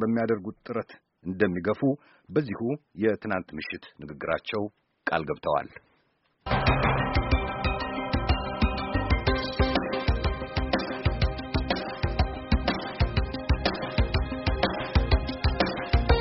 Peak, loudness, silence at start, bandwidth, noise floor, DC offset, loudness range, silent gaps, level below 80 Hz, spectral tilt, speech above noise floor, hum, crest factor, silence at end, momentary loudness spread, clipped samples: -8 dBFS; -28 LUFS; 0 s; 6 kHz; -69 dBFS; under 0.1%; 4 LU; none; -32 dBFS; -5 dB/octave; 41 dB; none; 20 dB; 0 s; 9 LU; under 0.1%